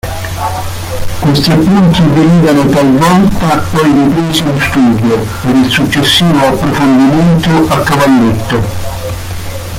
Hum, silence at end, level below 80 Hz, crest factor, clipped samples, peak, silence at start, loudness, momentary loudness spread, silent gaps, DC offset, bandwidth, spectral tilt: none; 0 s; -28 dBFS; 8 dB; under 0.1%; 0 dBFS; 0.05 s; -9 LUFS; 12 LU; none; under 0.1%; 16.5 kHz; -6 dB/octave